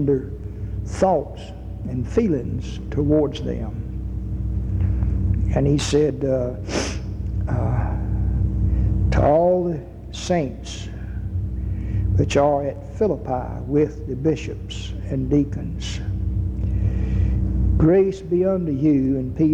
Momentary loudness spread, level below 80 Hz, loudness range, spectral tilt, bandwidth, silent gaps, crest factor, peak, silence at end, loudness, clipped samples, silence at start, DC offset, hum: 12 LU; -28 dBFS; 3 LU; -7.5 dB/octave; 9.8 kHz; none; 16 dB; -6 dBFS; 0 s; -22 LUFS; under 0.1%; 0 s; under 0.1%; none